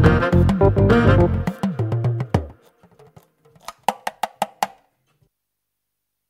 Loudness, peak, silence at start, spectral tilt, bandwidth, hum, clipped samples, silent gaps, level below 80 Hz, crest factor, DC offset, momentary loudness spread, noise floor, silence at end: -19 LUFS; -2 dBFS; 0 s; -7.5 dB/octave; 15.5 kHz; 50 Hz at -45 dBFS; under 0.1%; none; -32 dBFS; 18 dB; under 0.1%; 13 LU; -79 dBFS; 1.6 s